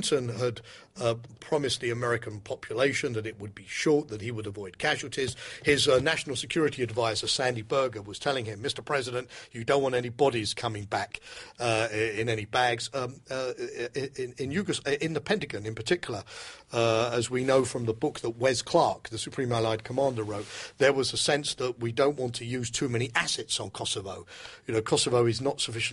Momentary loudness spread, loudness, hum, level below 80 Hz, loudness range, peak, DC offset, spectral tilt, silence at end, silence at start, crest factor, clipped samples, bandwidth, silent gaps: 11 LU; -29 LUFS; none; -60 dBFS; 3 LU; -10 dBFS; under 0.1%; -4 dB/octave; 0 s; 0 s; 20 dB; under 0.1%; 11.5 kHz; none